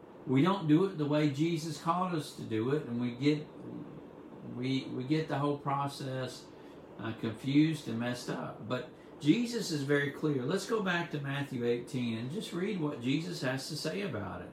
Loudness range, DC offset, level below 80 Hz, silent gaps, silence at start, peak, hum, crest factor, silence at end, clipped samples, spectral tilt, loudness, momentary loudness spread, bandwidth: 4 LU; under 0.1%; -72 dBFS; none; 0 s; -14 dBFS; none; 20 dB; 0 s; under 0.1%; -6 dB/octave; -33 LUFS; 14 LU; 15 kHz